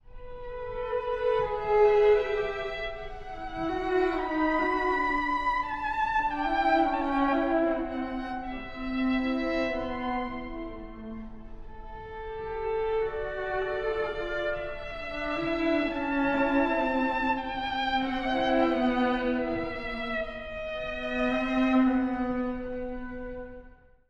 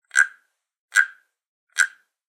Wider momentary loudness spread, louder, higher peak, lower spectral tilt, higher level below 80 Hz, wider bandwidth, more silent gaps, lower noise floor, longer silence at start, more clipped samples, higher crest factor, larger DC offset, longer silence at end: first, 14 LU vs 6 LU; second, -28 LUFS vs -22 LUFS; second, -12 dBFS vs -2 dBFS; first, -6 dB/octave vs 5 dB/octave; first, -44 dBFS vs -86 dBFS; second, 7.4 kHz vs 17 kHz; second, none vs 0.79-0.88 s, 1.47-1.67 s; second, -52 dBFS vs -58 dBFS; about the same, 0.05 s vs 0.15 s; neither; second, 16 dB vs 24 dB; neither; about the same, 0.35 s vs 0.4 s